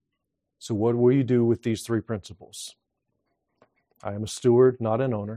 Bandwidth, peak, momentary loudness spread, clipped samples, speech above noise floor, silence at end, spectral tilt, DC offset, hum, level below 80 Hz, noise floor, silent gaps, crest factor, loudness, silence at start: 14 kHz; -8 dBFS; 19 LU; under 0.1%; 58 dB; 0 s; -7 dB/octave; under 0.1%; none; -64 dBFS; -81 dBFS; none; 18 dB; -24 LUFS; 0.6 s